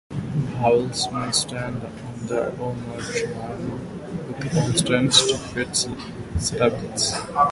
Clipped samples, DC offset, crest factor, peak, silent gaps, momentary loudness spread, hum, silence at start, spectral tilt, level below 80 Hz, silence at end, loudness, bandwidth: under 0.1%; under 0.1%; 22 dB; -2 dBFS; none; 14 LU; none; 0.1 s; -3.5 dB/octave; -44 dBFS; 0 s; -23 LUFS; 11.5 kHz